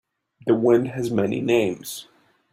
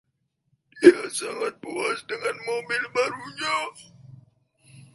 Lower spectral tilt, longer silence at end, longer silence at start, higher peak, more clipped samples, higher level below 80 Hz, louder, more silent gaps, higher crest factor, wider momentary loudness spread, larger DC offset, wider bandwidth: first, -6 dB/octave vs -3.5 dB/octave; first, 0.5 s vs 0.15 s; second, 0.45 s vs 0.75 s; second, -6 dBFS vs 0 dBFS; neither; first, -62 dBFS vs -70 dBFS; about the same, -22 LUFS vs -24 LUFS; neither; second, 18 dB vs 26 dB; about the same, 15 LU vs 13 LU; neither; first, 16 kHz vs 11.5 kHz